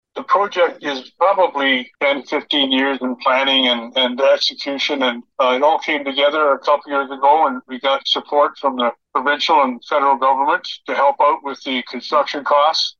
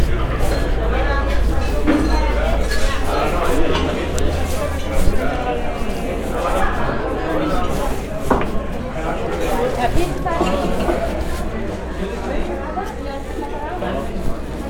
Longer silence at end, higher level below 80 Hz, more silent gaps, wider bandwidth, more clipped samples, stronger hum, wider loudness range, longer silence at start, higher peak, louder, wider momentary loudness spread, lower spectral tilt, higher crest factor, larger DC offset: about the same, 0.1 s vs 0 s; second, -74 dBFS vs -22 dBFS; neither; second, 7.2 kHz vs 17.5 kHz; neither; neither; second, 1 LU vs 4 LU; first, 0.15 s vs 0 s; about the same, -2 dBFS vs 0 dBFS; first, -17 LUFS vs -21 LUFS; about the same, 7 LU vs 7 LU; second, -2 dB/octave vs -6 dB/octave; about the same, 14 dB vs 18 dB; neither